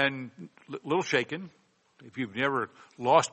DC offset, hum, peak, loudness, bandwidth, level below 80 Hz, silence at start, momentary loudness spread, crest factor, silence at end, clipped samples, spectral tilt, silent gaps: under 0.1%; none; -8 dBFS; -30 LUFS; 8.4 kHz; -74 dBFS; 0 s; 19 LU; 22 dB; 0.05 s; under 0.1%; -4 dB/octave; none